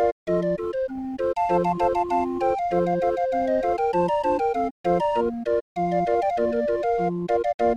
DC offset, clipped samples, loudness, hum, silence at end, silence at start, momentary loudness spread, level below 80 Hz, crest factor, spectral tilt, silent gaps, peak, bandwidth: under 0.1%; under 0.1%; -24 LUFS; none; 0 s; 0 s; 4 LU; -50 dBFS; 12 dB; -8 dB/octave; 0.12-0.26 s, 4.71-4.84 s, 5.61-5.75 s, 7.54-7.59 s; -10 dBFS; 10 kHz